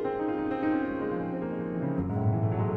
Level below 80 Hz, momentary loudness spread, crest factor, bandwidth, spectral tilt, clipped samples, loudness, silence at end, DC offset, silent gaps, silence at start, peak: -54 dBFS; 5 LU; 12 dB; 4.4 kHz; -11 dB/octave; under 0.1%; -30 LUFS; 0 s; under 0.1%; none; 0 s; -16 dBFS